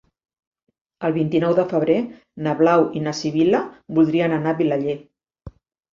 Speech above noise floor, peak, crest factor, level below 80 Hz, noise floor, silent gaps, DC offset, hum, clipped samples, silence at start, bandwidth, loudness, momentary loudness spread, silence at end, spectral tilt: 24 dB; -4 dBFS; 16 dB; -56 dBFS; -43 dBFS; none; under 0.1%; none; under 0.1%; 1 s; 7.4 kHz; -20 LUFS; 10 LU; 0.45 s; -7 dB/octave